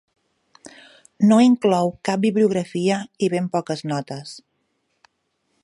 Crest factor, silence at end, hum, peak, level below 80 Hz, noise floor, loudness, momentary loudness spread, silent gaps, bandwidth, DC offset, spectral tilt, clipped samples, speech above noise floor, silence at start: 18 dB; 1.25 s; none; -4 dBFS; -66 dBFS; -71 dBFS; -20 LUFS; 13 LU; none; 11.5 kHz; under 0.1%; -6.5 dB/octave; under 0.1%; 52 dB; 1.2 s